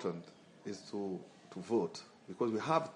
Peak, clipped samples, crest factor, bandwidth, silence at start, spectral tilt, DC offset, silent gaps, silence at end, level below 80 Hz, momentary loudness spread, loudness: -18 dBFS; under 0.1%; 22 dB; 10.5 kHz; 0 s; -6 dB/octave; under 0.1%; none; 0 s; -84 dBFS; 17 LU; -38 LUFS